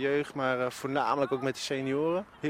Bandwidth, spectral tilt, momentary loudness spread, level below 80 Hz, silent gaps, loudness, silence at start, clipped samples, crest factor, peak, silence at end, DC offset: 16 kHz; -5 dB/octave; 3 LU; -68 dBFS; none; -30 LUFS; 0 s; under 0.1%; 18 dB; -12 dBFS; 0 s; under 0.1%